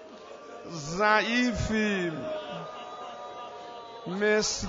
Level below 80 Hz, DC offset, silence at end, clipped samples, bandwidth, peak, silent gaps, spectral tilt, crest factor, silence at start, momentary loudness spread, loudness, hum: -50 dBFS; under 0.1%; 0 s; under 0.1%; 7.8 kHz; -10 dBFS; none; -4 dB/octave; 20 dB; 0 s; 19 LU; -28 LUFS; none